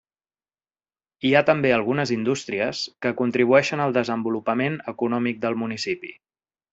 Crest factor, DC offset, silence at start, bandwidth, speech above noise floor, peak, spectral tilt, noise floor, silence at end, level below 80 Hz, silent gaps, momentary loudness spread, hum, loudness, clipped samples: 22 dB; under 0.1%; 1.25 s; 8 kHz; over 68 dB; -2 dBFS; -5.5 dB/octave; under -90 dBFS; 0.6 s; -64 dBFS; none; 9 LU; none; -23 LUFS; under 0.1%